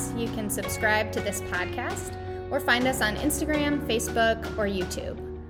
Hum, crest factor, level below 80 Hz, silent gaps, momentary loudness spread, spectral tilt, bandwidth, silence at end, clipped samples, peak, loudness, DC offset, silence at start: none; 20 dB; -42 dBFS; none; 9 LU; -4 dB/octave; 19 kHz; 0 s; under 0.1%; -8 dBFS; -27 LUFS; under 0.1%; 0 s